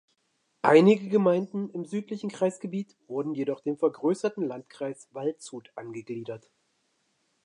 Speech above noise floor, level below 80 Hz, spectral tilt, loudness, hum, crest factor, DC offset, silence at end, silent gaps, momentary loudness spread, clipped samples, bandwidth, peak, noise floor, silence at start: 47 dB; -82 dBFS; -7 dB/octave; -27 LUFS; none; 24 dB; under 0.1%; 1.05 s; none; 19 LU; under 0.1%; 10.5 kHz; -4 dBFS; -74 dBFS; 0.65 s